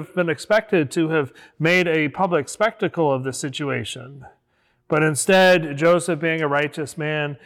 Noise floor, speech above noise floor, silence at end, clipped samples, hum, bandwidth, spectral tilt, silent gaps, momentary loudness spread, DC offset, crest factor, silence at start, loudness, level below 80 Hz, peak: -66 dBFS; 45 dB; 0.1 s; under 0.1%; none; 18.5 kHz; -4.5 dB/octave; none; 10 LU; under 0.1%; 12 dB; 0 s; -20 LUFS; -64 dBFS; -8 dBFS